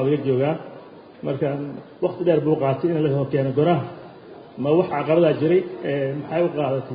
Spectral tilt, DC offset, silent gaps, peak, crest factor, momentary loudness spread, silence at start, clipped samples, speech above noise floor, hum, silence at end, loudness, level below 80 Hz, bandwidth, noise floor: -12.5 dB/octave; under 0.1%; none; -6 dBFS; 16 dB; 15 LU; 0 s; under 0.1%; 21 dB; none; 0 s; -22 LUFS; -60 dBFS; 5 kHz; -42 dBFS